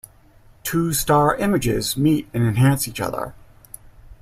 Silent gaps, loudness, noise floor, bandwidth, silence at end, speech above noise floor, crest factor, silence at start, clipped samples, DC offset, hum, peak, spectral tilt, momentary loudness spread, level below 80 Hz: none; -20 LUFS; -50 dBFS; 16 kHz; 0.05 s; 31 dB; 18 dB; 0.65 s; under 0.1%; under 0.1%; none; -4 dBFS; -5.5 dB/octave; 10 LU; -42 dBFS